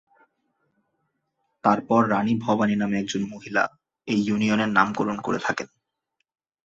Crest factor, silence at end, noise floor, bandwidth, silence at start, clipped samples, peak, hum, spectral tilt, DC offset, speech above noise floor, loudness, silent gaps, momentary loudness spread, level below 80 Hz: 22 dB; 1 s; -78 dBFS; 7.8 kHz; 1.65 s; under 0.1%; -4 dBFS; none; -5.5 dB/octave; under 0.1%; 55 dB; -24 LUFS; none; 8 LU; -62 dBFS